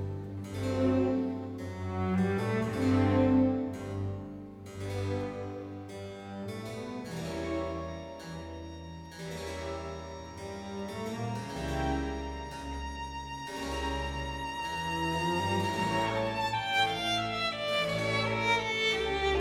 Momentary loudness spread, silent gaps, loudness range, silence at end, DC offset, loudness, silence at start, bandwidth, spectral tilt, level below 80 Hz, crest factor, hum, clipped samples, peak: 14 LU; none; 10 LU; 0 s; under 0.1%; -32 LUFS; 0 s; 16 kHz; -5.5 dB/octave; -48 dBFS; 18 dB; none; under 0.1%; -14 dBFS